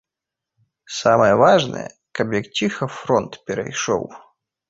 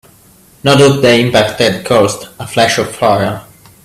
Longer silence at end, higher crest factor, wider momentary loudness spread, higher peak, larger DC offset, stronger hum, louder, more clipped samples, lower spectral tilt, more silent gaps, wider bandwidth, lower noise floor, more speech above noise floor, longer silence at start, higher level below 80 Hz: about the same, 0.5 s vs 0.4 s; first, 18 dB vs 12 dB; first, 16 LU vs 11 LU; about the same, -2 dBFS vs 0 dBFS; neither; neither; second, -19 LUFS vs -11 LUFS; neither; about the same, -4.5 dB/octave vs -4.5 dB/octave; neither; second, 7.8 kHz vs 15.5 kHz; first, -85 dBFS vs -44 dBFS; first, 67 dB vs 33 dB; first, 0.9 s vs 0.65 s; second, -56 dBFS vs -46 dBFS